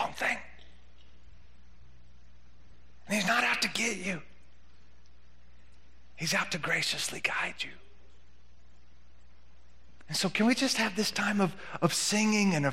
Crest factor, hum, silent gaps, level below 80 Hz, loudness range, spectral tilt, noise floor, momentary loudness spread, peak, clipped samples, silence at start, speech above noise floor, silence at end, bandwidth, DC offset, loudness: 24 dB; none; none; -60 dBFS; 7 LU; -3 dB/octave; -60 dBFS; 9 LU; -10 dBFS; under 0.1%; 0 s; 30 dB; 0 s; 16 kHz; 0.6%; -29 LUFS